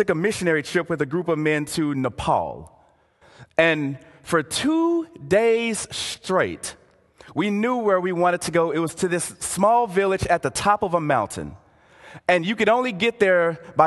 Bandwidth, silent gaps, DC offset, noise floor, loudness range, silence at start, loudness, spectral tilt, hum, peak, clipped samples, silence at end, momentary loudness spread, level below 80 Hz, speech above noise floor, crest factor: 12.5 kHz; none; under 0.1%; -57 dBFS; 3 LU; 0 s; -22 LUFS; -4.5 dB/octave; none; -2 dBFS; under 0.1%; 0 s; 9 LU; -50 dBFS; 36 dB; 20 dB